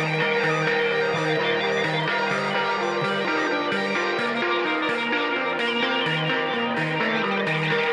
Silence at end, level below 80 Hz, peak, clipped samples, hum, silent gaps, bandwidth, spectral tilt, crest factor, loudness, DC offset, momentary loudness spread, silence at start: 0 s; -70 dBFS; -8 dBFS; under 0.1%; none; none; 11 kHz; -5 dB/octave; 14 dB; -23 LUFS; under 0.1%; 2 LU; 0 s